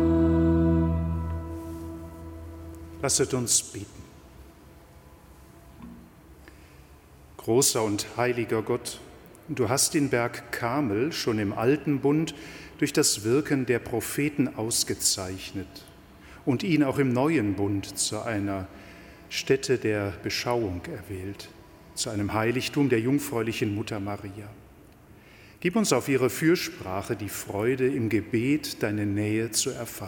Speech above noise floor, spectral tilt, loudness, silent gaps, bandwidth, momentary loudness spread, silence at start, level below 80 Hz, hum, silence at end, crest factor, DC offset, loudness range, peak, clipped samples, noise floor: 25 dB; -4.5 dB/octave; -26 LUFS; none; 17.5 kHz; 18 LU; 0 s; -46 dBFS; none; 0 s; 20 dB; under 0.1%; 4 LU; -8 dBFS; under 0.1%; -52 dBFS